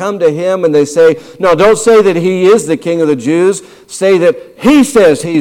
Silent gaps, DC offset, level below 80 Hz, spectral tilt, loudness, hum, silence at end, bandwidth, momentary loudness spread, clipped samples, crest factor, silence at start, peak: none; under 0.1%; -44 dBFS; -5 dB/octave; -9 LUFS; none; 0 s; 16 kHz; 7 LU; under 0.1%; 8 dB; 0 s; 0 dBFS